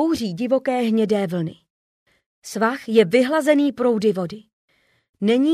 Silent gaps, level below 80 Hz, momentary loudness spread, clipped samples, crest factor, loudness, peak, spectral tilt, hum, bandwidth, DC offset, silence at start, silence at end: 1.70-2.06 s, 2.26-2.42 s, 4.53-4.68 s, 5.09-5.14 s; -64 dBFS; 14 LU; under 0.1%; 16 dB; -20 LUFS; -4 dBFS; -6 dB/octave; none; 15 kHz; under 0.1%; 0 s; 0 s